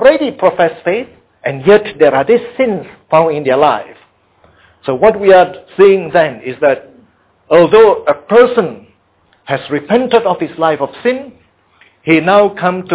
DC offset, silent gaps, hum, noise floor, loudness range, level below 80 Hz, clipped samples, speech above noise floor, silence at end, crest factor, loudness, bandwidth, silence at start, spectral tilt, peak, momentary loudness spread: under 0.1%; none; none; -54 dBFS; 3 LU; -50 dBFS; 0.2%; 43 dB; 0 s; 12 dB; -11 LUFS; 4 kHz; 0 s; -9.5 dB/octave; 0 dBFS; 12 LU